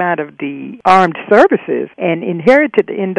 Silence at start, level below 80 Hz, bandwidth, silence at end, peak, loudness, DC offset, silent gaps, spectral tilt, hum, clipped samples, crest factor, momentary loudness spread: 0 s; -56 dBFS; 11 kHz; 0 s; 0 dBFS; -12 LUFS; under 0.1%; none; -7 dB/octave; none; 0.4%; 12 dB; 11 LU